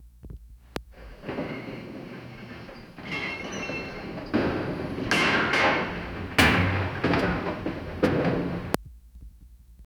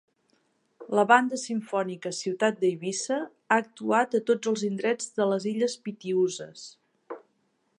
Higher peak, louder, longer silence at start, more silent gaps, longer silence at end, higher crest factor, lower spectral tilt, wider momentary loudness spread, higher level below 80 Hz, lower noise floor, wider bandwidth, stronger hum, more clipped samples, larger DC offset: first, 0 dBFS vs -4 dBFS; about the same, -26 LUFS vs -27 LUFS; second, 0 s vs 0.8 s; neither; second, 0.15 s vs 0.6 s; first, 28 dB vs 22 dB; about the same, -5 dB/octave vs -4 dB/octave; about the same, 20 LU vs 18 LU; first, -44 dBFS vs -82 dBFS; second, -50 dBFS vs -72 dBFS; first, over 20 kHz vs 11 kHz; neither; neither; neither